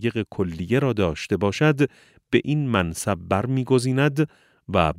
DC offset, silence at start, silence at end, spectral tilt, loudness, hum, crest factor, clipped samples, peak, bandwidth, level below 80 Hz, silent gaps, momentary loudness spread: under 0.1%; 0 s; 0 s; -6.5 dB/octave; -23 LUFS; none; 20 dB; under 0.1%; -4 dBFS; 15.5 kHz; -46 dBFS; none; 6 LU